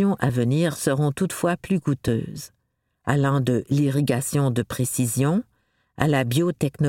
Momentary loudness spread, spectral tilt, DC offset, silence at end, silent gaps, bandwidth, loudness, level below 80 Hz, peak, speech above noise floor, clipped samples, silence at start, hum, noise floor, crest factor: 5 LU; -6 dB/octave; under 0.1%; 0 s; none; 17 kHz; -23 LUFS; -52 dBFS; -4 dBFS; 48 dB; under 0.1%; 0 s; none; -70 dBFS; 18 dB